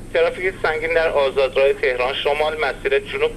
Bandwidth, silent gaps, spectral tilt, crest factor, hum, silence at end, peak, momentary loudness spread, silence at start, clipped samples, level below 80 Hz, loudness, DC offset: 13 kHz; none; -4 dB/octave; 14 dB; none; 0 s; -6 dBFS; 4 LU; 0 s; under 0.1%; -40 dBFS; -19 LUFS; under 0.1%